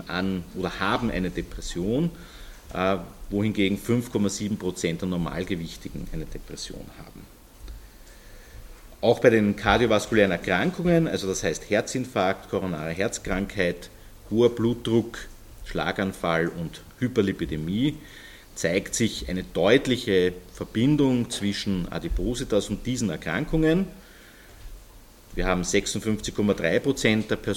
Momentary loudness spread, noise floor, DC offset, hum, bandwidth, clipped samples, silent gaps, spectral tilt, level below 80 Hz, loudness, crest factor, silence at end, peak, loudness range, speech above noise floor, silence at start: 15 LU; -49 dBFS; under 0.1%; none; 17.5 kHz; under 0.1%; none; -5 dB/octave; -42 dBFS; -25 LUFS; 22 dB; 0 s; -2 dBFS; 6 LU; 24 dB; 0 s